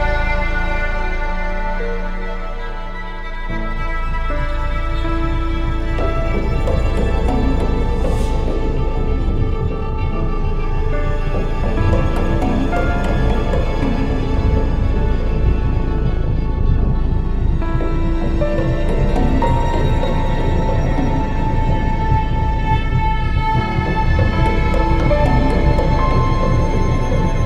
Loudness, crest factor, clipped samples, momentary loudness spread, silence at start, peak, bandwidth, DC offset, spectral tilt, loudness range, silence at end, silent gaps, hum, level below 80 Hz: -19 LUFS; 14 dB; under 0.1%; 7 LU; 0 s; -2 dBFS; 7.6 kHz; under 0.1%; -7.5 dB/octave; 6 LU; 0 s; none; none; -18 dBFS